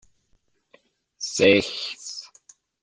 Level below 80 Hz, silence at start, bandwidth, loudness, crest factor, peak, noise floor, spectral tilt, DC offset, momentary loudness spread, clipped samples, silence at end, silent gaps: -62 dBFS; 1.2 s; 10 kHz; -22 LUFS; 22 dB; -4 dBFS; -67 dBFS; -3.5 dB/octave; under 0.1%; 18 LU; under 0.1%; 0.55 s; none